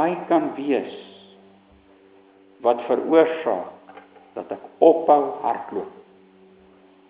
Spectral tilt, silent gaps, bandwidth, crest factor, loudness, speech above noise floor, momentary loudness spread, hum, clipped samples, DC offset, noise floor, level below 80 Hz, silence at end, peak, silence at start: -9.5 dB/octave; none; 4 kHz; 22 dB; -21 LUFS; 33 dB; 19 LU; none; under 0.1%; under 0.1%; -53 dBFS; -72 dBFS; 1.2 s; -2 dBFS; 0 s